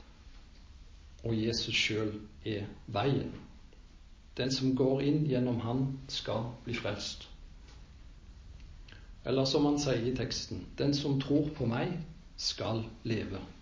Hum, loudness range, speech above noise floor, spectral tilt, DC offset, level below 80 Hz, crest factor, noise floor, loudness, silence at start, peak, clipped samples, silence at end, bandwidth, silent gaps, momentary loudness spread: none; 5 LU; 21 dB; -5.5 dB/octave; under 0.1%; -52 dBFS; 18 dB; -54 dBFS; -33 LUFS; 0 s; -16 dBFS; under 0.1%; 0 s; 7.6 kHz; none; 17 LU